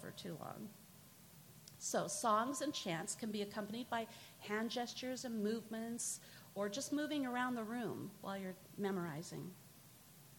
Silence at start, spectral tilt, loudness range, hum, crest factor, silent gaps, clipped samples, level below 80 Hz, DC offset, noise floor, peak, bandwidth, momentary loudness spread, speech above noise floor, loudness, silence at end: 0 s; -3.5 dB/octave; 2 LU; none; 20 dB; none; under 0.1%; -82 dBFS; under 0.1%; -62 dBFS; -22 dBFS; 17.5 kHz; 20 LU; 20 dB; -42 LUFS; 0 s